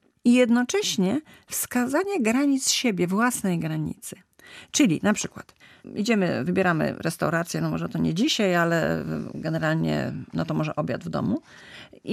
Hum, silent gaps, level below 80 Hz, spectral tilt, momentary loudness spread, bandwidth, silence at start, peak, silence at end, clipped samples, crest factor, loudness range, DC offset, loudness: none; none; -60 dBFS; -4.5 dB/octave; 11 LU; 14.5 kHz; 0.25 s; -8 dBFS; 0 s; under 0.1%; 16 dB; 3 LU; under 0.1%; -24 LUFS